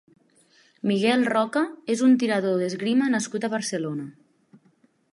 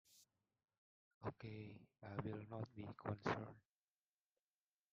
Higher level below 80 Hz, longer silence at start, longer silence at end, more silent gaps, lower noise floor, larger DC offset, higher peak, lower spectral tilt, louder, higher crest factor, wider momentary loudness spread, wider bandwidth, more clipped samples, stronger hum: about the same, -76 dBFS vs -80 dBFS; first, 0.85 s vs 0.1 s; second, 1.05 s vs 1.35 s; second, none vs 0.78-1.21 s; second, -63 dBFS vs under -90 dBFS; neither; first, -8 dBFS vs -26 dBFS; about the same, -5 dB/octave vs -6 dB/octave; first, -24 LUFS vs -50 LUFS; second, 16 dB vs 26 dB; second, 10 LU vs 13 LU; first, 11.5 kHz vs 7.2 kHz; neither; neither